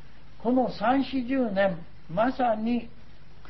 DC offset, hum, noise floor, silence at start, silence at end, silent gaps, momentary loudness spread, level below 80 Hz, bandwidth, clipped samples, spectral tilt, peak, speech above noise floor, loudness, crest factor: 1%; none; -51 dBFS; 0.05 s; 0.6 s; none; 7 LU; -54 dBFS; 6 kHz; under 0.1%; -8.5 dB/octave; -12 dBFS; 25 dB; -27 LUFS; 16 dB